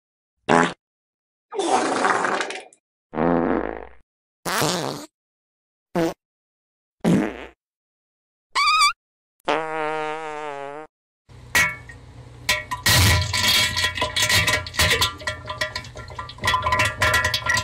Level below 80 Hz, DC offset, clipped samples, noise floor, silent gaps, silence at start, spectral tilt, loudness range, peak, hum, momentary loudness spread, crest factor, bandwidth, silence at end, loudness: -42 dBFS; under 0.1%; under 0.1%; -42 dBFS; 0.79-1.49 s, 2.80-3.10 s, 4.03-4.43 s, 5.14-5.86 s, 6.25-6.98 s, 7.56-8.50 s, 8.96-9.44 s, 10.89-11.25 s; 0.5 s; -3 dB/octave; 9 LU; -2 dBFS; none; 17 LU; 22 dB; 16 kHz; 0 s; -21 LUFS